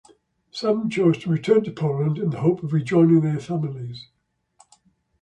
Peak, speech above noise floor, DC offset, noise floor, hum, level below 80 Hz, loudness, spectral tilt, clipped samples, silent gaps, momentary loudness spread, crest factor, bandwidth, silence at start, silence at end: -6 dBFS; 39 dB; under 0.1%; -60 dBFS; none; -62 dBFS; -21 LUFS; -8.5 dB/octave; under 0.1%; none; 14 LU; 16 dB; 8.8 kHz; 0.55 s; 1.2 s